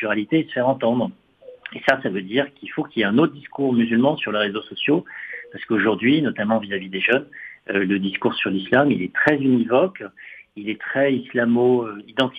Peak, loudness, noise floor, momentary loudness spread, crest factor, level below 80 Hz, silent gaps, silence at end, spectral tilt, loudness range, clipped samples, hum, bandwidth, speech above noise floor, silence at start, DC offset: -2 dBFS; -21 LUFS; -41 dBFS; 15 LU; 18 dB; -64 dBFS; none; 0 s; -7.5 dB/octave; 2 LU; under 0.1%; none; 6.6 kHz; 20 dB; 0 s; under 0.1%